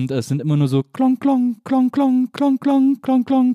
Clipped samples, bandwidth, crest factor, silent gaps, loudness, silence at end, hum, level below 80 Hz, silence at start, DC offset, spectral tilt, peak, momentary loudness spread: under 0.1%; 11.5 kHz; 10 dB; none; -18 LUFS; 0 s; none; -68 dBFS; 0 s; under 0.1%; -8 dB/octave; -6 dBFS; 4 LU